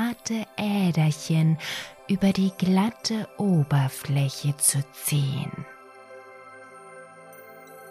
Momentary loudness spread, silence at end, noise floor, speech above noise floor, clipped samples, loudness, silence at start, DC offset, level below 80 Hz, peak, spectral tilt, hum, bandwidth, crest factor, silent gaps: 23 LU; 0 s; -46 dBFS; 22 dB; under 0.1%; -25 LUFS; 0 s; under 0.1%; -60 dBFS; -6 dBFS; -5 dB/octave; none; 15.5 kHz; 20 dB; none